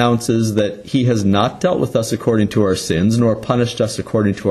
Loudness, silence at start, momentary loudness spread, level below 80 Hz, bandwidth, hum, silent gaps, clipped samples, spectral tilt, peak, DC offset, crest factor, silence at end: -17 LUFS; 0 s; 4 LU; -46 dBFS; 13 kHz; none; none; under 0.1%; -6 dB/octave; -2 dBFS; under 0.1%; 14 dB; 0 s